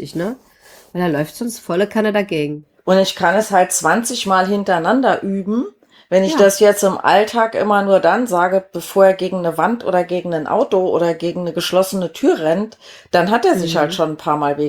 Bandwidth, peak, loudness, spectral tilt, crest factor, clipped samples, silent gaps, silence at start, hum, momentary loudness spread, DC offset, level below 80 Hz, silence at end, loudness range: 19.5 kHz; 0 dBFS; -16 LUFS; -4.5 dB/octave; 16 dB; under 0.1%; none; 0 s; none; 8 LU; under 0.1%; -58 dBFS; 0 s; 3 LU